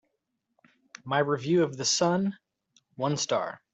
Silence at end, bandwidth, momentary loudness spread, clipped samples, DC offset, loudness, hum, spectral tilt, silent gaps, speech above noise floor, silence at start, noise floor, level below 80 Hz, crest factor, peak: 0.15 s; 8.2 kHz; 8 LU; under 0.1%; under 0.1%; -27 LUFS; none; -4 dB/octave; none; 53 dB; 1.05 s; -80 dBFS; -70 dBFS; 18 dB; -12 dBFS